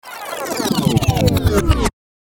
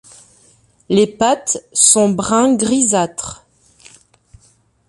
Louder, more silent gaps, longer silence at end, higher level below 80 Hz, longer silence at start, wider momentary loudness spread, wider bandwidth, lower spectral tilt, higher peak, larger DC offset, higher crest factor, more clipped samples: second, -17 LUFS vs -14 LUFS; neither; second, 0.45 s vs 1.55 s; first, -26 dBFS vs -52 dBFS; second, 0.05 s vs 0.9 s; about the same, 9 LU vs 10 LU; first, 17.5 kHz vs 12 kHz; first, -5.5 dB/octave vs -3.5 dB/octave; about the same, 0 dBFS vs 0 dBFS; neither; about the same, 16 dB vs 18 dB; neither